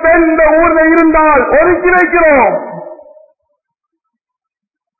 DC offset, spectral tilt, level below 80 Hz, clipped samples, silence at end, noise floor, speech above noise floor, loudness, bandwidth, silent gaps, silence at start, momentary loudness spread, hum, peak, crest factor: under 0.1%; -9.5 dB/octave; -34 dBFS; under 0.1%; 2.05 s; -82 dBFS; 74 dB; -8 LUFS; 2.7 kHz; none; 0 s; 7 LU; none; 0 dBFS; 10 dB